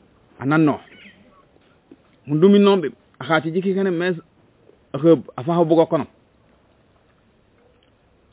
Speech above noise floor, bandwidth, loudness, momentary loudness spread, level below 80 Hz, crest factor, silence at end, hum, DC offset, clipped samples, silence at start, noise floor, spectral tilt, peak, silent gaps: 41 dB; 4 kHz; -19 LUFS; 16 LU; -64 dBFS; 20 dB; 2.25 s; none; under 0.1%; under 0.1%; 0.4 s; -58 dBFS; -11.5 dB/octave; -2 dBFS; none